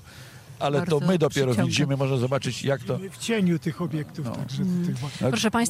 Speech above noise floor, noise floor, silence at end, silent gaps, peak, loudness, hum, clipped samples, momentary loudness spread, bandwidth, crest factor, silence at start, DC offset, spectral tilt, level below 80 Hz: 21 dB; -45 dBFS; 0 s; none; -10 dBFS; -25 LUFS; none; under 0.1%; 9 LU; 15.5 kHz; 16 dB; 0.05 s; under 0.1%; -5.5 dB/octave; -58 dBFS